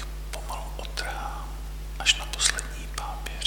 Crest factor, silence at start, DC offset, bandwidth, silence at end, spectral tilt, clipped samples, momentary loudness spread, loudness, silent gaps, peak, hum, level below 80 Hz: 24 dB; 0 s; under 0.1%; 19 kHz; 0 s; -1 dB/octave; under 0.1%; 14 LU; -29 LUFS; none; -6 dBFS; none; -36 dBFS